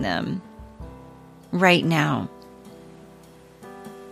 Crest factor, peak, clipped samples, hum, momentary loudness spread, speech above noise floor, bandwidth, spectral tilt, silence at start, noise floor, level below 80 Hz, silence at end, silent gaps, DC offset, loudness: 24 dB; -2 dBFS; under 0.1%; none; 27 LU; 27 dB; 14 kHz; -5.5 dB/octave; 0 s; -48 dBFS; -52 dBFS; 0 s; none; under 0.1%; -22 LUFS